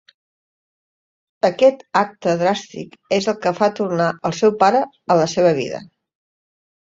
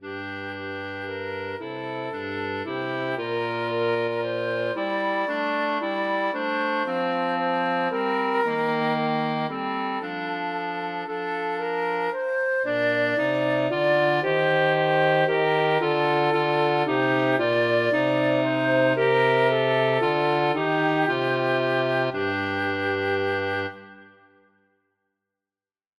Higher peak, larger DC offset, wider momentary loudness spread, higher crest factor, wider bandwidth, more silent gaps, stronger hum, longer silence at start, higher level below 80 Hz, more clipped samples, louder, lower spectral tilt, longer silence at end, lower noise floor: first, -2 dBFS vs -8 dBFS; neither; about the same, 9 LU vs 9 LU; about the same, 18 dB vs 16 dB; second, 7.8 kHz vs 12 kHz; neither; neither; first, 1.45 s vs 0 s; first, -64 dBFS vs -70 dBFS; neither; first, -18 LUFS vs -24 LUFS; second, -5.5 dB/octave vs -7 dB/octave; second, 1.1 s vs 1.95 s; about the same, under -90 dBFS vs under -90 dBFS